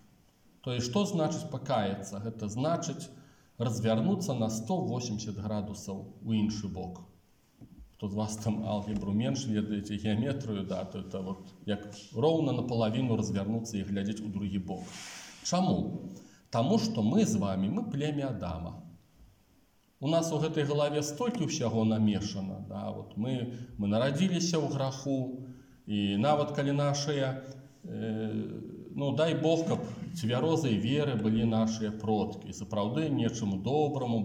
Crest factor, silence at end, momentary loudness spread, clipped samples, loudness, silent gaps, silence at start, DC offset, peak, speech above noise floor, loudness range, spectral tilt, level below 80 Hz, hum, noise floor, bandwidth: 18 dB; 0 s; 12 LU; under 0.1%; -32 LUFS; none; 0.65 s; under 0.1%; -14 dBFS; 35 dB; 4 LU; -6 dB/octave; -62 dBFS; none; -66 dBFS; 16 kHz